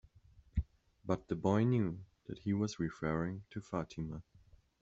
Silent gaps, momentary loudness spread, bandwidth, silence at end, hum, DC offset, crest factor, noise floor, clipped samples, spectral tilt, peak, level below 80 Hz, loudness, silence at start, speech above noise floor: none; 17 LU; 7.8 kHz; 0.6 s; none; under 0.1%; 20 dB; -64 dBFS; under 0.1%; -7.5 dB/octave; -18 dBFS; -52 dBFS; -37 LUFS; 0.55 s; 28 dB